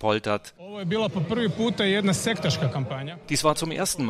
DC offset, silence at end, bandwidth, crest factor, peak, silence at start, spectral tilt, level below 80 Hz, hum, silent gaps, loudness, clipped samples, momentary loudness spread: under 0.1%; 0 s; 15.5 kHz; 18 dB; -6 dBFS; 0 s; -4.5 dB/octave; -56 dBFS; none; none; -25 LUFS; under 0.1%; 9 LU